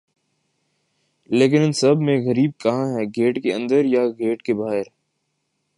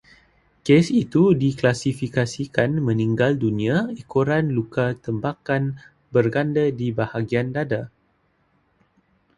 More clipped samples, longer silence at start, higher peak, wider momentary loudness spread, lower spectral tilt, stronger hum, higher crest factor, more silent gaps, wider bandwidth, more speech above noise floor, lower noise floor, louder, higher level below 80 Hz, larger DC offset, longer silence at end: neither; first, 1.3 s vs 0.65 s; second, -4 dBFS vs 0 dBFS; about the same, 7 LU vs 9 LU; about the same, -6.5 dB/octave vs -7 dB/octave; neither; about the same, 18 dB vs 22 dB; neither; about the same, 11.5 kHz vs 11.5 kHz; first, 54 dB vs 44 dB; first, -73 dBFS vs -65 dBFS; about the same, -20 LUFS vs -22 LUFS; second, -68 dBFS vs -54 dBFS; neither; second, 0.95 s vs 1.5 s